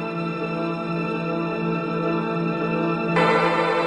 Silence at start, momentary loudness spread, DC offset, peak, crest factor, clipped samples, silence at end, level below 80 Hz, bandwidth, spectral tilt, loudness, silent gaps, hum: 0 s; 7 LU; under 0.1%; -6 dBFS; 16 dB; under 0.1%; 0 s; -60 dBFS; 10 kHz; -7.5 dB/octave; -23 LUFS; none; none